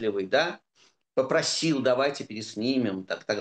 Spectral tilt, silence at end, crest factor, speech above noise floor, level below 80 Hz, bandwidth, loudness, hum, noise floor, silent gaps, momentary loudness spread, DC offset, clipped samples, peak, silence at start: -4 dB/octave; 0 s; 16 dB; 38 dB; -76 dBFS; 10 kHz; -27 LUFS; none; -65 dBFS; none; 10 LU; under 0.1%; under 0.1%; -10 dBFS; 0 s